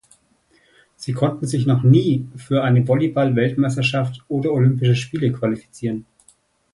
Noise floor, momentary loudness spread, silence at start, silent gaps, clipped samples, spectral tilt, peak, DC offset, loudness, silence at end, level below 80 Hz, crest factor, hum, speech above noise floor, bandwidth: -59 dBFS; 11 LU; 1 s; none; under 0.1%; -7.5 dB/octave; -2 dBFS; under 0.1%; -19 LUFS; 0.7 s; -56 dBFS; 18 dB; none; 41 dB; 11.5 kHz